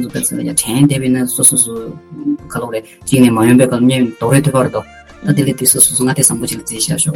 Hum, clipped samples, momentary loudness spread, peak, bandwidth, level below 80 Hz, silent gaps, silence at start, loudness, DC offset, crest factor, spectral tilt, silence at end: none; 0.2%; 13 LU; 0 dBFS; 19 kHz; -46 dBFS; none; 0 s; -12 LUFS; under 0.1%; 14 dB; -4.5 dB/octave; 0 s